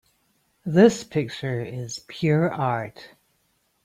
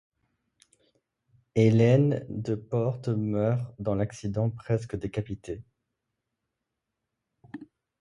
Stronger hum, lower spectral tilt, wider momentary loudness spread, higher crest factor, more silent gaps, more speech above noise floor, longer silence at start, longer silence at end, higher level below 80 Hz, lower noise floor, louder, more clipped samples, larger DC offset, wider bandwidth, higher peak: neither; second, -6.5 dB/octave vs -8.5 dB/octave; second, 16 LU vs 19 LU; about the same, 22 dB vs 20 dB; neither; second, 46 dB vs 58 dB; second, 0.65 s vs 1.55 s; first, 0.8 s vs 0.35 s; second, -62 dBFS vs -56 dBFS; second, -69 dBFS vs -84 dBFS; first, -23 LUFS vs -27 LUFS; neither; neither; first, 15 kHz vs 10.5 kHz; first, -2 dBFS vs -8 dBFS